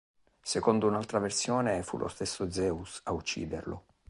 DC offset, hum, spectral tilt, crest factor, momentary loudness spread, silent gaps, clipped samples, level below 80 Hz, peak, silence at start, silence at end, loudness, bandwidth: under 0.1%; none; -4.5 dB/octave; 22 dB; 10 LU; none; under 0.1%; -54 dBFS; -10 dBFS; 0.45 s; 0.3 s; -32 LUFS; 11.5 kHz